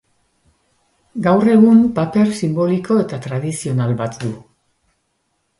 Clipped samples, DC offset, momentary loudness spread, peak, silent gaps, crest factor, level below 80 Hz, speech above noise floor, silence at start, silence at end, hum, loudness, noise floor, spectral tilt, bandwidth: under 0.1%; under 0.1%; 15 LU; 0 dBFS; none; 16 dB; -54 dBFS; 53 dB; 1.15 s; 1.2 s; none; -16 LUFS; -68 dBFS; -7.5 dB/octave; 11.5 kHz